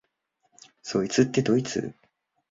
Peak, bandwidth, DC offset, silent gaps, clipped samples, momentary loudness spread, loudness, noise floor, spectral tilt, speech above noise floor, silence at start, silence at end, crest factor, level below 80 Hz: -6 dBFS; 7.8 kHz; under 0.1%; none; under 0.1%; 15 LU; -25 LUFS; -74 dBFS; -5.5 dB/octave; 50 dB; 0.85 s; 0.6 s; 20 dB; -62 dBFS